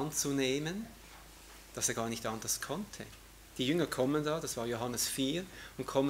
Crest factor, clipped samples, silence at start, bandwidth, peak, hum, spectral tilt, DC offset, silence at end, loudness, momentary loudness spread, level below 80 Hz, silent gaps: 20 dB; under 0.1%; 0 s; 16 kHz; -16 dBFS; none; -3.5 dB/octave; under 0.1%; 0 s; -35 LUFS; 19 LU; -60 dBFS; none